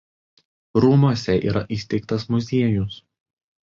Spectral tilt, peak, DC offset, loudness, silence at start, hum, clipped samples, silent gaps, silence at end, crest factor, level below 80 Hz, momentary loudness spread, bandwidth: -8 dB/octave; -4 dBFS; under 0.1%; -21 LUFS; 0.75 s; none; under 0.1%; none; 0.65 s; 18 dB; -46 dBFS; 9 LU; 7.4 kHz